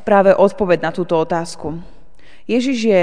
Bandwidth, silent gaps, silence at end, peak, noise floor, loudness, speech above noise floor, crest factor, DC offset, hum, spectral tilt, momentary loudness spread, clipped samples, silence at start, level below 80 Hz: 10 kHz; none; 0 s; 0 dBFS; -48 dBFS; -16 LUFS; 33 dB; 16 dB; 3%; none; -6 dB/octave; 16 LU; under 0.1%; 0.05 s; -48 dBFS